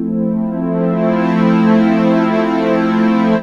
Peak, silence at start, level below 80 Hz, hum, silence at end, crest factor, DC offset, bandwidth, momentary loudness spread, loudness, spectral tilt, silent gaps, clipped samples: 0 dBFS; 0 s; -46 dBFS; none; 0 s; 12 dB; under 0.1%; 6.8 kHz; 6 LU; -14 LUFS; -8.5 dB/octave; none; under 0.1%